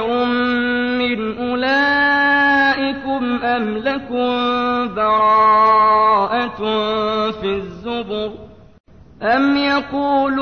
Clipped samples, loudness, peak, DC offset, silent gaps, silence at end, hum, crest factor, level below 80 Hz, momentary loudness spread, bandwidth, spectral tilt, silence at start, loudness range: under 0.1%; -16 LUFS; -4 dBFS; 0.3%; 8.80-8.84 s; 0 s; none; 12 dB; -48 dBFS; 11 LU; 6.6 kHz; -6 dB/octave; 0 s; 5 LU